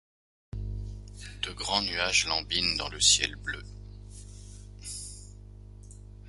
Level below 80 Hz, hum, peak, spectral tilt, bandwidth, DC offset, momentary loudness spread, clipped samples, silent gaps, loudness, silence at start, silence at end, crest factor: -46 dBFS; 50 Hz at -45 dBFS; -6 dBFS; -1 dB/octave; 11.5 kHz; under 0.1%; 25 LU; under 0.1%; none; -27 LUFS; 0.55 s; 0 s; 26 dB